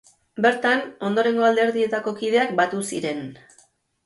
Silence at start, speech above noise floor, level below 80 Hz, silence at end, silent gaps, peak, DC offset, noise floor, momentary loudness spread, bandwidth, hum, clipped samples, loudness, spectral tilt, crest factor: 0.35 s; 38 dB; -70 dBFS; 0.7 s; none; -4 dBFS; under 0.1%; -59 dBFS; 10 LU; 11.5 kHz; none; under 0.1%; -21 LUFS; -4.5 dB/octave; 18 dB